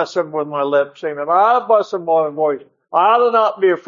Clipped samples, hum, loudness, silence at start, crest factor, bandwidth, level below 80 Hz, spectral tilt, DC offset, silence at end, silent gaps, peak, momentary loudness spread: under 0.1%; none; -16 LUFS; 0 s; 14 dB; 7.4 kHz; -76 dBFS; -5.5 dB/octave; under 0.1%; 0.05 s; none; -2 dBFS; 9 LU